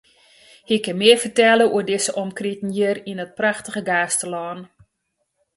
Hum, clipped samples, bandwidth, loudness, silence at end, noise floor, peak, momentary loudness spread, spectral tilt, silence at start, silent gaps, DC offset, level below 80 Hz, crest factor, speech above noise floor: none; under 0.1%; 12 kHz; -19 LUFS; 0.9 s; -74 dBFS; 0 dBFS; 13 LU; -3 dB/octave; 0.7 s; none; under 0.1%; -66 dBFS; 20 dB; 55 dB